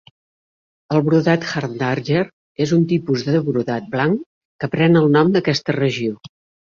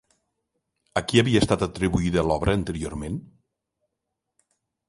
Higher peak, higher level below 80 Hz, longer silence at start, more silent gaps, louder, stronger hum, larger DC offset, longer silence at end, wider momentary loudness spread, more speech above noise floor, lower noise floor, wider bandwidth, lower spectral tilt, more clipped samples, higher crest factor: about the same, -2 dBFS vs -4 dBFS; second, -56 dBFS vs -42 dBFS; about the same, 0.9 s vs 0.95 s; first, 2.33-2.55 s, 4.26-4.59 s vs none; first, -18 LUFS vs -24 LUFS; neither; neither; second, 0.35 s vs 1.65 s; about the same, 10 LU vs 12 LU; first, over 73 dB vs 59 dB; first, under -90 dBFS vs -82 dBFS; second, 7.2 kHz vs 11.5 kHz; first, -7 dB/octave vs -5.5 dB/octave; neither; second, 16 dB vs 22 dB